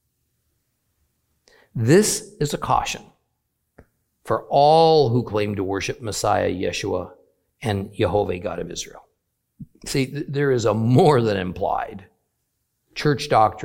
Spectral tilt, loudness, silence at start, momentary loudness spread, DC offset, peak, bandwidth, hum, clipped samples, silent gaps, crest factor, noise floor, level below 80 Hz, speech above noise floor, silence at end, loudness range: -5.5 dB/octave; -21 LUFS; 1.75 s; 15 LU; under 0.1%; -2 dBFS; 16.5 kHz; none; under 0.1%; none; 20 dB; -74 dBFS; -50 dBFS; 54 dB; 0 s; 6 LU